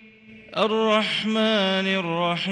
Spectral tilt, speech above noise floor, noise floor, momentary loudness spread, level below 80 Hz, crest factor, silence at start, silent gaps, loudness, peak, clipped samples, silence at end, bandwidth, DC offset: -5 dB/octave; 25 dB; -47 dBFS; 4 LU; -68 dBFS; 14 dB; 0.3 s; none; -22 LUFS; -8 dBFS; under 0.1%; 0 s; 11 kHz; under 0.1%